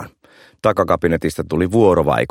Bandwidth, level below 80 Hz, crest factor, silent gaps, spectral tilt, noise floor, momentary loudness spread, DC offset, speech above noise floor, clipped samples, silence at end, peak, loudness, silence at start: 16.5 kHz; -40 dBFS; 16 dB; none; -7 dB/octave; -49 dBFS; 7 LU; under 0.1%; 34 dB; under 0.1%; 0.05 s; -2 dBFS; -17 LUFS; 0 s